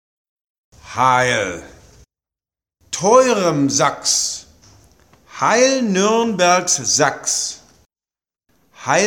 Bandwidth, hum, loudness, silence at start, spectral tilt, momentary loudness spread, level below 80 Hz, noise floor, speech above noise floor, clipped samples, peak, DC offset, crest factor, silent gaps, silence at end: 17.5 kHz; none; -16 LUFS; 0.85 s; -2.5 dB/octave; 14 LU; -56 dBFS; under -90 dBFS; over 74 dB; under 0.1%; -2 dBFS; under 0.1%; 18 dB; none; 0 s